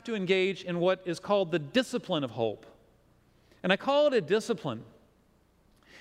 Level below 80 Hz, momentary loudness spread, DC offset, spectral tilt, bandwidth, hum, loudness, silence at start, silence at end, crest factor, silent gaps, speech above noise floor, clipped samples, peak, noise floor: -70 dBFS; 9 LU; under 0.1%; -5.5 dB/octave; 13.5 kHz; none; -29 LUFS; 0.05 s; 0 s; 22 dB; none; 37 dB; under 0.1%; -8 dBFS; -65 dBFS